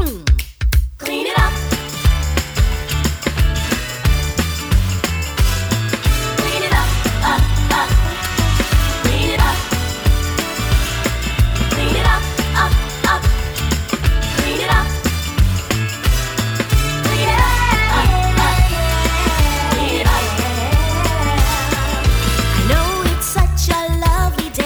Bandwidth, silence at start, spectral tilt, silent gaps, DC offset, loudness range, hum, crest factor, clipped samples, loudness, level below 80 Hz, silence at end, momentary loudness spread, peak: over 20 kHz; 0 s; -4.5 dB/octave; none; under 0.1%; 3 LU; none; 14 dB; under 0.1%; -17 LUFS; -18 dBFS; 0 s; 4 LU; 0 dBFS